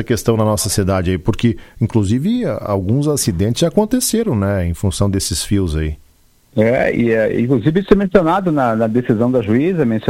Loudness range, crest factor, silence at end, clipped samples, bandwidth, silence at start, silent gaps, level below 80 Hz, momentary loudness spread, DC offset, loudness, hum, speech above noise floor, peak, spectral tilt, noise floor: 3 LU; 16 dB; 0 s; under 0.1%; 16.5 kHz; 0 s; none; -34 dBFS; 5 LU; under 0.1%; -16 LUFS; none; 36 dB; 0 dBFS; -5.5 dB/octave; -51 dBFS